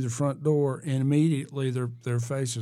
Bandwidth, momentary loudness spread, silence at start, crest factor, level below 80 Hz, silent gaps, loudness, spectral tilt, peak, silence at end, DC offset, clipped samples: 13 kHz; 7 LU; 0 s; 14 dB; -74 dBFS; none; -27 LUFS; -7 dB/octave; -12 dBFS; 0 s; under 0.1%; under 0.1%